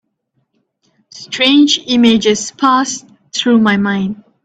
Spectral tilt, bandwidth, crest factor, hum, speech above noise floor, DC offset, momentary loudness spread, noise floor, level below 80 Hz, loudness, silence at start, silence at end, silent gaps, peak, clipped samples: -3.5 dB/octave; 9 kHz; 14 dB; none; 54 dB; under 0.1%; 13 LU; -66 dBFS; -54 dBFS; -12 LUFS; 1.15 s; 0.3 s; none; 0 dBFS; under 0.1%